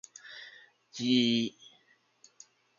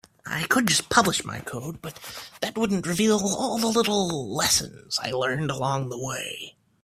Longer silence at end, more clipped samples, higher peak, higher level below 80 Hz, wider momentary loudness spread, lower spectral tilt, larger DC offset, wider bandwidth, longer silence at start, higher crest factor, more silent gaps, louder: first, 1.3 s vs 0.35 s; neither; second, -12 dBFS vs -2 dBFS; second, -78 dBFS vs -56 dBFS; first, 21 LU vs 15 LU; about the same, -4 dB/octave vs -3 dB/octave; neither; second, 7.4 kHz vs 16 kHz; about the same, 0.25 s vs 0.25 s; about the same, 22 dB vs 24 dB; neither; second, -29 LUFS vs -24 LUFS